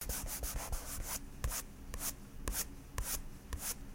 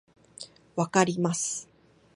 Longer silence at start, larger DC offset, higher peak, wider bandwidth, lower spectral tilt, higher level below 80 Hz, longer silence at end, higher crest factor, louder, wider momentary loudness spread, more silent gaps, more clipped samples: second, 0 s vs 0.4 s; neither; second, -14 dBFS vs -6 dBFS; first, 16.5 kHz vs 11.5 kHz; second, -2.5 dB/octave vs -4.5 dB/octave; first, -44 dBFS vs -70 dBFS; second, 0 s vs 0.5 s; about the same, 28 dB vs 24 dB; second, -41 LUFS vs -27 LUFS; second, 4 LU vs 20 LU; neither; neither